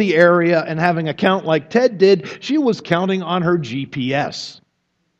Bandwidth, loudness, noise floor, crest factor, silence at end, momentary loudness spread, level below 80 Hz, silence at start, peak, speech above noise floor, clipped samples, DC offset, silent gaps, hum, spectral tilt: 8 kHz; -17 LUFS; -69 dBFS; 18 dB; 0.65 s; 10 LU; -62 dBFS; 0 s; 0 dBFS; 52 dB; under 0.1%; under 0.1%; none; none; -6.5 dB/octave